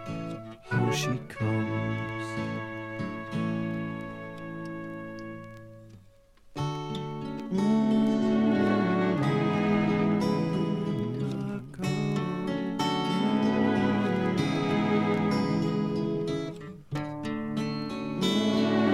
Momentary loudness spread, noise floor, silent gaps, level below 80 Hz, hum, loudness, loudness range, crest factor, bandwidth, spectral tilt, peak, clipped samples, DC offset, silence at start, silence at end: 13 LU; -56 dBFS; none; -58 dBFS; none; -29 LUFS; 10 LU; 16 dB; 13.5 kHz; -6.5 dB/octave; -12 dBFS; under 0.1%; under 0.1%; 0 s; 0 s